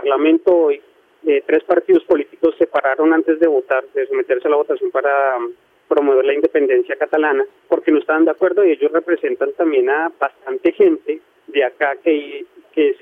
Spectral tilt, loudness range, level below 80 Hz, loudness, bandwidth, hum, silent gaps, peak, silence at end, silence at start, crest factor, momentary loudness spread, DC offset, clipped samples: -6.5 dB/octave; 2 LU; -66 dBFS; -17 LUFS; 3.8 kHz; none; none; -2 dBFS; 0.05 s; 0 s; 14 dB; 7 LU; under 0.1%; under 0.1%